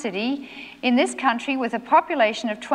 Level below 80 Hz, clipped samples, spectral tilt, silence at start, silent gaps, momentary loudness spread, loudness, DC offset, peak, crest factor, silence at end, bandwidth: -68 dBFS; under 0.1%; -3.5 dB/octave; 0 s; none; 9 LU; -22 LUFS; under 0.1%; -6 dBFS; 16 dB; 0 s; 11 kHz